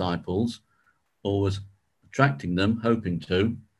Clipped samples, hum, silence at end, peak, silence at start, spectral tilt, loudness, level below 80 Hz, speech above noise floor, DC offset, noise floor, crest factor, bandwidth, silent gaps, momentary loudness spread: under 0.1%; none; 0.2 s; -4 dBFS; 0 s; -7 dB/octave; -26 LUFS; -46 dBFS; 43 dB; under 0.1%; -68 dBFS; 22 dB; 11.5 kHz; none; 11 LU